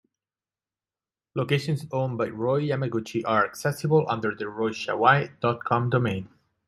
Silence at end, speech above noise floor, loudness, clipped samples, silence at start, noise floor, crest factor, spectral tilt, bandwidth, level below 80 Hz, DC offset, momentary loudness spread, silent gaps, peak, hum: 0.4 s; over 65 dB; -25 LUFS; under 0.1%; 1.35 s; under -90 dBFS; 22 dB; -6.5 dB/octave; 13.5 kHz; -66 dBFS; under 0.1%; 8 LU; none; -4 dBFS; none